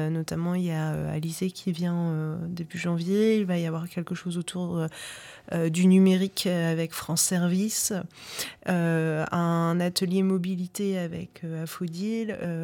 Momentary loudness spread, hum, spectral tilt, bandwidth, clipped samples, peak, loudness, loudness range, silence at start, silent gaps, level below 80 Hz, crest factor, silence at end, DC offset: 11 LU; none; -5.5 dB/octave; 18 kHz; under 0.1%; -10 dBFS; -27 LUFS; 4 LU; 0 s; none; -62 dBFS; 16 dB; 0 s; under 0.1%